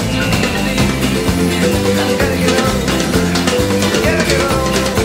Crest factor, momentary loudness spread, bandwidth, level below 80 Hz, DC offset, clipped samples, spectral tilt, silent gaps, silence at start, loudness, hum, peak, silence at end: 14 dB; 2 LU; 16.5 kHz; -28 dBFS; under 0.1%; under 0.1%; -4.5 dB/octave; none; 0 s; -14 LUFS; none; 0 dBFS; 0 s